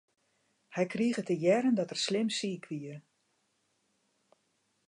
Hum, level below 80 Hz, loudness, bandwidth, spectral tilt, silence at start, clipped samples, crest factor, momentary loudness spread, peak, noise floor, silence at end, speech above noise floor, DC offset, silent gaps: none; -84 dBFS; -31 LUFS; 11 kHz; -5 dB/octave; 0.7 s; under 0.1%; 20 dB; 14 LU; -14 dBFS; -76 dBFS; 1.9 s; 46 dB; under 0.1%; none